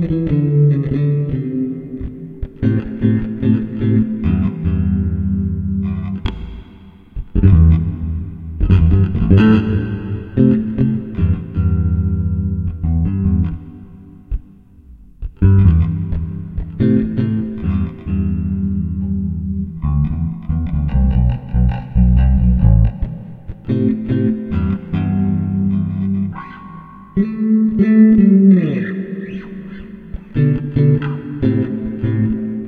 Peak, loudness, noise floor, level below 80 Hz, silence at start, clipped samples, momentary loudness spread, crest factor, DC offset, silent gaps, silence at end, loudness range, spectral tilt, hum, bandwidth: 0 dBFS; -16 LUFS; -42 dBFS; -24 dBFS; 0 s; under 0.1%; 17 LU; 16 dB; under 0.1%; none; 0 s; 5 LU; -11.5 dB/octave; none; 4.6 kHz